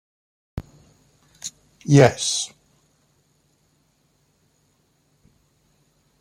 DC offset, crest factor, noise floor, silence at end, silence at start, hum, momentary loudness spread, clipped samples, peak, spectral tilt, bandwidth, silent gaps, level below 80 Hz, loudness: under 0.1%; 24 dB; -65 dBFS; 3.75 s; 0.55 s; none; 23 LU; under 0.1%; -2 dBFS; -5 dB/octave; 13.5 kHz; none; -54 dBFS; -20 LUFS